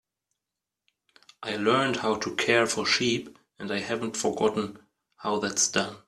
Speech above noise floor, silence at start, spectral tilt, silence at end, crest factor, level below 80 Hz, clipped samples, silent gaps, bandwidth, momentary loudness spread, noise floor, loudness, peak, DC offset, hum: 61 dB; 1.4 s; -2.5 dB/octave; 0.1 s; 22 dB; -66 dBFS; under 0.1%; none; 14 kHz; 11 LU; -88 dBFS; -26 LUFS; -6 dBFS; under 0.1%; none